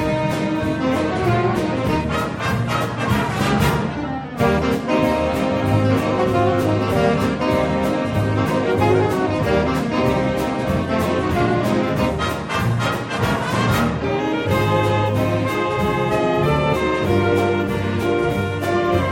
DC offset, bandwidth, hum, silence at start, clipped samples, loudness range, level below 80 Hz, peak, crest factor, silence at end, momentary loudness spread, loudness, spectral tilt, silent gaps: under 0.1%; 16.5 kHz; none; 0 s; under 0.1%; 2 LU; -36 dBFS; -4 dBFS; 14 dB; 0 s; 4 LU; -19 LUFS; -6.5 dB/octave; none